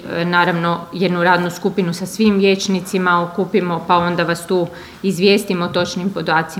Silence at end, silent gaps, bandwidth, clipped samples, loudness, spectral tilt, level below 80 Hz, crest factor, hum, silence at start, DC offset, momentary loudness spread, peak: 0 s; none; 16 kHz; under 0.1%; -17 LUFS; -5.5 dB/octave; -54 dBFS; 16 dB; none; 0 s; under 0.1%; 6 LU; 0 dBFS